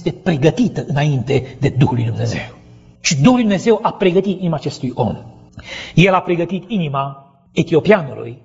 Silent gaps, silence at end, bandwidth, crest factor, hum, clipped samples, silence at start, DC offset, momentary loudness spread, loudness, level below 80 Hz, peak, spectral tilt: none; 0.1 s; 8 kHz; 16 dB; none; under 0.1%; 0 s; under 0.1%; 11 LU; -16 LUFS; -44 dBFS; 0 dBFS; -6 dB/octave